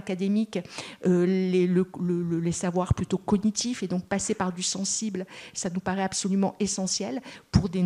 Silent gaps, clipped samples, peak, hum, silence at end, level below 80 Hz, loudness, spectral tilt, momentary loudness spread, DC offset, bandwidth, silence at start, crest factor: none; under 0.1%; -6 dBFS; none; 0 s; -46 dBFS; -27 LUFS; -5 dB/octave; 9 LU; under 0.1%; 11.5 kHz; 0 s; 20 dB